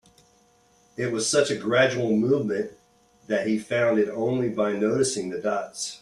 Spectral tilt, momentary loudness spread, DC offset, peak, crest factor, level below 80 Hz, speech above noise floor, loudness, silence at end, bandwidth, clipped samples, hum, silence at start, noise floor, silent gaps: -4.5 dB/octave; 8 LU; under 0.1%; -6 dBFS; 18 dB; -66 dBFS; 37 dB; -24 LUFS; 0.05 s; 12.5 kHz; under 0.1%; none; 1 s; -61 dBFS; none